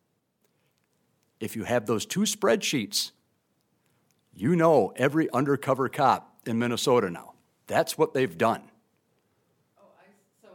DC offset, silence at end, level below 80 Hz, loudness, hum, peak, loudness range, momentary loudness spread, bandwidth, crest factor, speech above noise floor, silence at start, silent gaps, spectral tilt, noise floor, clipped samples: under 0.1%; 1.95 s; -72 dBFS; -26 LUFS; none; -8 dBFS; 4 LU; 11 LU; 17.5 kHz; 20 dB; 48 dB; 1.4 s; none; -4.5 dB/octave; -73 dBFS; under 0.1%